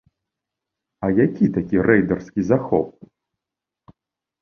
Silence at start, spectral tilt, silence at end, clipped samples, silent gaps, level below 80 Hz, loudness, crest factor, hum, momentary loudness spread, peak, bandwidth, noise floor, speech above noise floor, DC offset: 1 s; -9.5 dB/octave; 1.5 s; under 0.1%; none; -50 dBFS; -20 LUFS; 20 dB; none; 7 LU; -2 dBFS; 6.6 kHz; -86 dBFS; 68 dB; under 0.1%